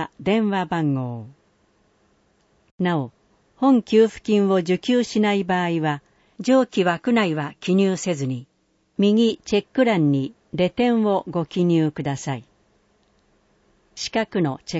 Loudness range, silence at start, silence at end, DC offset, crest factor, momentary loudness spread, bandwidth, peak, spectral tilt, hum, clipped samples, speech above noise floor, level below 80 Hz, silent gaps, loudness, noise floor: 5 LU; 0 s; 0 s; under 0.1%; 16 dB; 10 LU; 8 kHz; -6 dBFS; -6.5 dB/octave; none; under 0.1%; 44 dB; -60 dBFS; 2.71-2.78 s; -21 LUFS; -64 dBFS